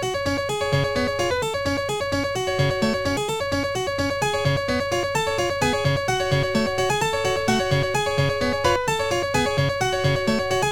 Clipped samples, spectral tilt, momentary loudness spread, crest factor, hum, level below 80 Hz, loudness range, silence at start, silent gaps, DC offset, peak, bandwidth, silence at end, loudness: under 0.1%; -4.5 dB/octave; 3 LU; 16 dB; none; -44 dBFS; 2 LU; 0 s; none; 0.5%; -6 dBFS; 18.5 kHz; 0 s; -22 LUFS